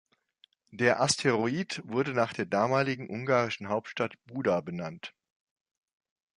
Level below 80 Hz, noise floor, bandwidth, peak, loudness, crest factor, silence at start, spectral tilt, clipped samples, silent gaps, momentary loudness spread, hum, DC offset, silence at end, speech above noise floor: -68 dBFS; -67 dBFS; 11.5 kHz; -10 dBFS; -29 LUFS; 20 dB; 0.75 s; -4.5 dB/octave; under 0.1%; none; 11 LU; none; under 0.1%; 1.3 s; 37 dB